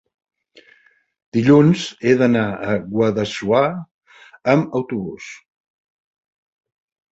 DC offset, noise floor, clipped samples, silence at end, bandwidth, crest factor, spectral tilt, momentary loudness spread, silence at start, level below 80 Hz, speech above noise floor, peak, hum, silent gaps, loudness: under 0.1%; -56 dBFS; under 0.1%; 1.75 s; 8.2 kHz; 18 dB; -7 dB/octave; 14 LU; 1.35 s; -56 dBFS; 39 dB; -2 dBFS; none; 3.91-3.99 s; -18 LUFS